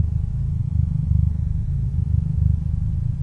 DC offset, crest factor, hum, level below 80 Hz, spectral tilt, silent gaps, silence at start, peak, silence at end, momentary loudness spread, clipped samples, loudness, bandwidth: under 0.1%; 14 dB; none; -26 dBFS; -11 dB/octave; none; 0 s; -6 dBFS; 0 s; 4 LU; under 0.1%; -23 LUFS; 1.9 kHz